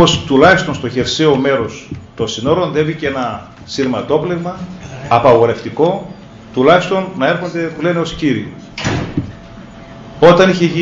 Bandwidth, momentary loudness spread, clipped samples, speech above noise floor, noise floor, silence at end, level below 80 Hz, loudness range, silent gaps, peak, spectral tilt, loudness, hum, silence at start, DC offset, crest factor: 8 kHz; 19 LU; 0.3%; 20 dB; -34 dBFS; 0 s; -42 dBFS; 4 LU; none; 0 dBFS; -5.5 dB/octave; -14 LUFS; none; 0 s; under 0.1%; 14 dB